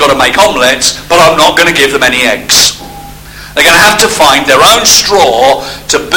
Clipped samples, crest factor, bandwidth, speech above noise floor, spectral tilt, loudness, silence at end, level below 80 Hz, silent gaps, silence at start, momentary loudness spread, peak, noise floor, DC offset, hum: 5%; 6 dB; over 20 kHz; 20 dB; -1 dB/octave; -5 LUFS; 0 s; -32 dBFS; none; 0 s; 6 LU; 0 dBFS; -27 dBFS; under 0.1%; none